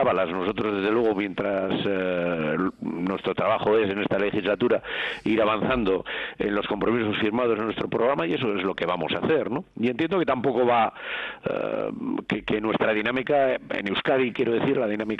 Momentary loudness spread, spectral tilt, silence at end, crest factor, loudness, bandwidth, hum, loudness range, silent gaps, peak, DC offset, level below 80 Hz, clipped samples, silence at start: 6 LU; -7.5 dB/octave; 0 s; 12 dB; -25 LUFS; 7.4 kHz; none; 1 LU; none; -12 dBFS; under 0.1%; -54 dBFS; under 0.1%; 0 s